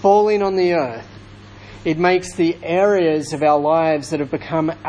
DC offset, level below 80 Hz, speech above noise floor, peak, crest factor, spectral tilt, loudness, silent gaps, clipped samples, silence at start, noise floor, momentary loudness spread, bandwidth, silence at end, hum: under 0.1%; -50 dBFS; 23 dB; -2 dBFS; 16 dB; -6 dB/octave; -18 LUFS; none; under 0.1%; 0 s; -40 dBFS; 8 LU; 10.5 kHz; 0 s; none